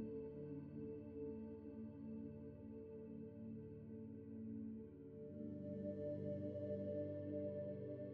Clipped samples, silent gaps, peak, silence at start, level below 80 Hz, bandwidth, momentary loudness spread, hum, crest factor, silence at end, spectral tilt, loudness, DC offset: under 0.1%; none; -36 dBFS; 0 s; -74 dBFS; 4.7 kHz; 8 LU; none; 14 dB; 0 s; -11 dB/octave; -51 LUFS; under 0.1%